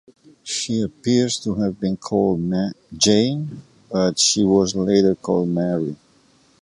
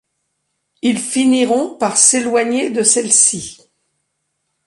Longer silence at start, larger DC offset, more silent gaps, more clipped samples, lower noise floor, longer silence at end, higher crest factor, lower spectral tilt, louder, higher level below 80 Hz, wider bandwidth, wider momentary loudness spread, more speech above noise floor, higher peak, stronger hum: second, 0.45 s vs 0.85 s; neither; neither; neither; second, -56 dBFS vs -71 dBFS; second, 0.65 s vs 1.15 s; about the same, 18 dB vs 16 dB; first, -4.5 dB/octave vs -2 dB/octave; second, -20 LUFS vs -13 LUFS; first, -52 dBFS vs -60 dBFS; about the same, 11.5 kHz vs 11.5 kHz; about the same, 11 LU vs 9 LU; second, 37 dB vs 57 dB; about the same, -2 dBFS vs 0 dBFS; neither